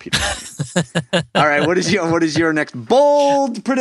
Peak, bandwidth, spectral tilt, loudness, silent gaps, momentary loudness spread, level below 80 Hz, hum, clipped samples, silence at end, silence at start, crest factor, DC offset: 0 dBFS; 12.5 kHz; -4.5 dB/octave; -16 LUFS; none; 8 LU; -44 dBFS; none; under 0.1%; 0 s; 0 s; 16 dB; under 0.1%